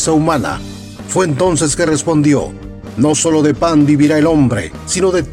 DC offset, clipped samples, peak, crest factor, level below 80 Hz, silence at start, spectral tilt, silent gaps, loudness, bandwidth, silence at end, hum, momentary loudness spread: under 0.1%; under 0.1%; -2 dBFS; 12 dB; -36 dBFS; 0 s; -5 dB/octave; none; -13 LUFS; 13 kHz; 0 s; none; 14 LU